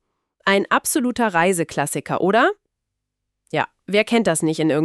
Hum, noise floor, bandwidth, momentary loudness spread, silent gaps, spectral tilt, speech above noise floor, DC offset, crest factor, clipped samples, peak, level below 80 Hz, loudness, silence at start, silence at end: none; -80 dBFS; 14 kHz; 7 LU; none; -4 dB/octave; 60 dB; under 0.1%; 18 dB; under 0.1%; -4 dBFS; -60 dBFS; -19 LUFS; 0.45 s; 0 s